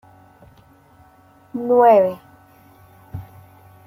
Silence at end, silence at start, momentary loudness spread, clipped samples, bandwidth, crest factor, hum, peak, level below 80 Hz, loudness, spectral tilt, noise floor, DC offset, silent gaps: 0.65 s; 1.55 s; 25 LU; under 0.1%; 16 kHz; 18 dB; none; -4 dBFS; -58 dBFS; -16 LUFS; -8.5 dB/octave; -51 dBFS; under 0.1%; none